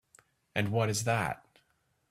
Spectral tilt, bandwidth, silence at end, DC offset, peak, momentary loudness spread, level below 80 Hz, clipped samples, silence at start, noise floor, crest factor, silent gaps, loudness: -4.5 dB/octave; 15.5 kHz; 0.75 s; under 0.1%; -12 dBFS; 8 LU; -64 dBFS; under 0.1%; 0.55 s; -74 dBFS; 22 dB; none; -31 LUFS